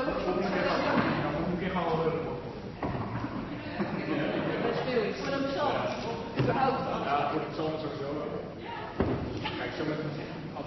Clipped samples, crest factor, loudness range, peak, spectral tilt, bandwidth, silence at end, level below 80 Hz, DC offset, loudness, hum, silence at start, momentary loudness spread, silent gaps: under 0.1%; 16 dB; 3 LU; -14 dBFS; -5 dB/octave; 6 kHz; 0 s; -52 dBFS; under 0.1%; -31 LUFS; none; 0 s; 9 LU; none